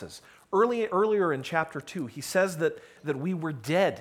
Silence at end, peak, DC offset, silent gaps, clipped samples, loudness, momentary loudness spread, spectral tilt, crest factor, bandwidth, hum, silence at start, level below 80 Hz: 0 s; -10 dBFS; under 0.1%; none; under 0.1%; -28 LUFS; 11 LU; -5.5 dB/octave; 18 dB; 17 kHz; none; 0 s; -70 dBFS